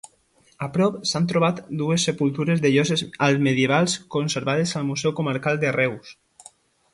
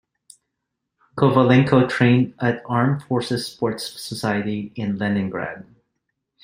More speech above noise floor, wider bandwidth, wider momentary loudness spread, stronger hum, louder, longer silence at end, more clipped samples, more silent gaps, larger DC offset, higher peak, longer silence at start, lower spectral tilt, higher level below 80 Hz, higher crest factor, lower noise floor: second, 38 dB vs 60 dB; second, 11.5 kHz vs 16 kHz; second, 6 LU vs 14 LU; neither; about the same, -22 LUFS vs -20 LUFS; about the same, 0.8 s vs 0.8 s; neither; neither; neither; second, -6 dBFS vs 0 dBFS; second, 0.05 s vs 1.15 s; second, -5 dB/octave vs -7 dB/octave; about the same, -62 dBFS vs -58 dBFS; about the same, 18 dB vs 20 dB; second, -60 dBFS vs -80 dBFS